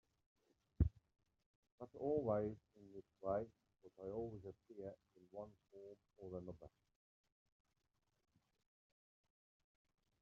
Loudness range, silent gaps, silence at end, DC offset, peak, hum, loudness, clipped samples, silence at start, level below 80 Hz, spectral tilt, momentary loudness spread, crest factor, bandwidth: 15 LU; 1.46-1.63 s, 1.72-1.78 s; 3.55 s; under 0.1%; -22 dBFS; none; -46 LUFS; under 0.1%; 0.8 s; -58 dBFS; -10.5 dB/octave; 19 LU; 26 dB; 6.4 kHz